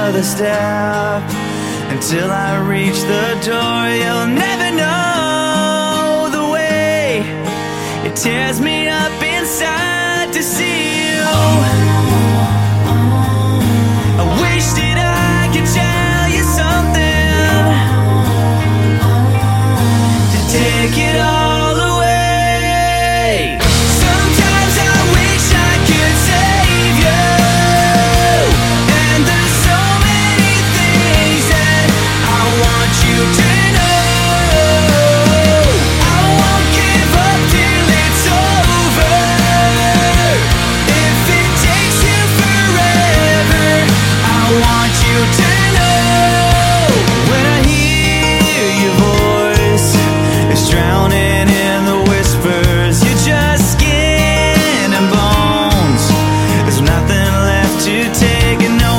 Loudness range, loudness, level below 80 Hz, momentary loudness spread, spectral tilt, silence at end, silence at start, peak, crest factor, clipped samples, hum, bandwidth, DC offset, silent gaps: 4 LU; -11 LUFS; -22 dBFS; 5 LU; -4.5 dB/octave; 0 s; 0 s; 0 dBFS; 12 dB; under 0.1%; none; 16.5 kHz; 0.2%; none